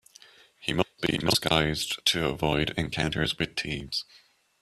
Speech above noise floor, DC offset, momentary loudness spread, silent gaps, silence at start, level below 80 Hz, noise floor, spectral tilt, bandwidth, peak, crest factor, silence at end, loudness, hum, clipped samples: 27 dB; under 0.1%; 8 LU; none; 0.6 s; -48 dBFS; -55 dBFS; -4 dB/octave; 15 kHz; -6 dBFS; 24 dB; 0.6 s; -27 LUFS; none; under 0.1%